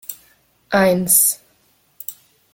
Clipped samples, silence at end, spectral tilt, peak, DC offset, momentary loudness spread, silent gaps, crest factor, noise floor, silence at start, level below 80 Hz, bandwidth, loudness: under 0.1%; 0.4 s; -3 dB/octave; 0 dBFS; under 0.1%; 20 LU; none; 20 dB; -59 dBFS; 0.1 s; -58 dBFS; 17 kHz; -14 LUFS